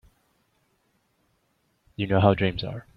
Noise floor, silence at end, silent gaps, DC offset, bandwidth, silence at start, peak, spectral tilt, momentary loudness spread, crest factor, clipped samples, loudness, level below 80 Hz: -70 dBFS; 0.15 s; none; under 0.1%; 5.2 kHz; 2 s; -4 dBFS; -9 dB/octave; 14 LU; 24 dB; under 0.1%; -24 LUFS; -52 dBFS